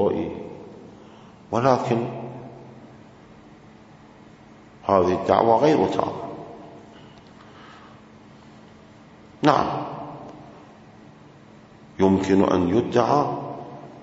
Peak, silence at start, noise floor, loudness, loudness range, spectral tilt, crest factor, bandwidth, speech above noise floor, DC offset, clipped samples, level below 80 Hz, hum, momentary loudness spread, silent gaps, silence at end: 0 dBFS; 0 s; -48 dBFS; -21 LUFS; 7 LU; -7 dB/octave; 24 dB; 8 kHz; 28 dB; under 0.1%; under 0.1%; -58 dBFS; none; 26 LU; none; 0 s